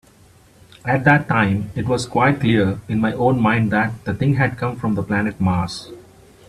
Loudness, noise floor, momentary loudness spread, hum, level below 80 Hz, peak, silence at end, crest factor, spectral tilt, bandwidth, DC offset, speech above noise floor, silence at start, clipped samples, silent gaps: -19 LUFS; -50 dBFS; 8 LU; none; -46 dBFS; 0 dBFS; 0.5 s; 18 dB; -7 dB/octave; 13 kHz; under 0.1%; 32 dB; 0.85 s; under 0.1%; none